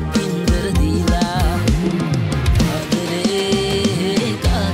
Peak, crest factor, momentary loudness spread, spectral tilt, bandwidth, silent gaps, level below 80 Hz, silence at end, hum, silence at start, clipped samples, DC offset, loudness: -6 dBFS; 12 dB; 2 LU; -5.5 dB/octave; 16 kHz; none; -24 dBFS; 0 s; none; 0 s; under 0.1%; under 0.1%; -18 LUFS